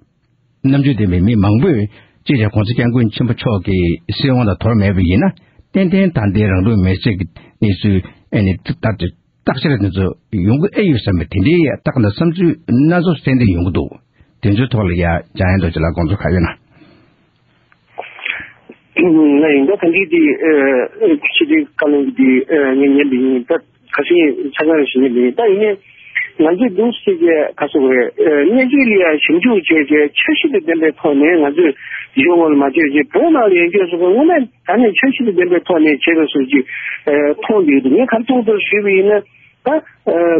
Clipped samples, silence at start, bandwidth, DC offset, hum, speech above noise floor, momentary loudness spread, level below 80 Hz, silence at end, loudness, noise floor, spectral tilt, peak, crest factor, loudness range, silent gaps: under 0.1%; 0.65 s; 5.2 kHz; under 0.1%; none; 46 dB; 8 LU; -38 dBFS; 0 s; -13 LUFS; -58 dBFS; -6 dB/octave; 0 dBFS; 12 dB; 5 LU; none